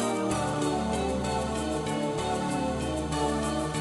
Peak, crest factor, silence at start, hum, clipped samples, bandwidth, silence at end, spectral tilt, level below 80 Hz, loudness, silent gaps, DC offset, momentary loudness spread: -16 dBFS; 12 dB; 0 s; none; under 0.1%; 12.5 kHz; 0 s; -5 dB/octave; -42 dBFS; -29 LUFS; none; under 0.1%; 2 LU